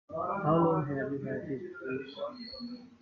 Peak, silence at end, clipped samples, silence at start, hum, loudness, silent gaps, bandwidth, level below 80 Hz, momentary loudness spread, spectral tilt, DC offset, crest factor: -14 dBFS; 0.05 s; under 0.1%; 0.1 s; none; -33 LUFS; none; 5.8 kHz; -70 dBFS; 15 LU; -9.5 dB/octave; under 0.1%; 18 dB